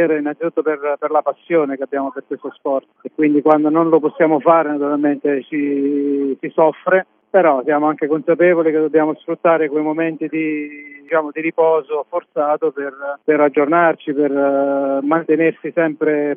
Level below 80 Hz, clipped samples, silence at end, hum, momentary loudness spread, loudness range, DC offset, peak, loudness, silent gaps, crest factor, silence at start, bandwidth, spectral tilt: -90 dBFS; under 0.1%; 0 s; none; 9 LU; 4 LU; under 0.1%; 0 dBFS; -17 LUFS; none; 16 dB; 0 s; 3.6 kHz; -10 dB/octave